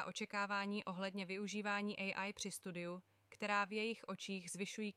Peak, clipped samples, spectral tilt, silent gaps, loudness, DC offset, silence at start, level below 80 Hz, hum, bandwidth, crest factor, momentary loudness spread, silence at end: -26 dBFS; under 0.1%; -4 dB/octave; none; -43 LUFS; under 0.1%; 0 s; -86 dBFS; none; 15 kHz; 18 dB; 8 LU; 0.05 s